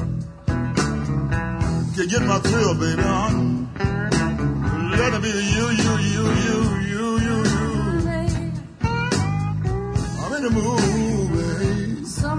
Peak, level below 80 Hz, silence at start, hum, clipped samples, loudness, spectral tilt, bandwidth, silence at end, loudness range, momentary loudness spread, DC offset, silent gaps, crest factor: -6 dBFS; -34 dBFS; 0 s; none; under 0.1%; -22 LUFS; -5.5 dB/octave; 10.5 kHz; 0 s; 2 LU; 6 LU; under 0.1%; none; 16 dB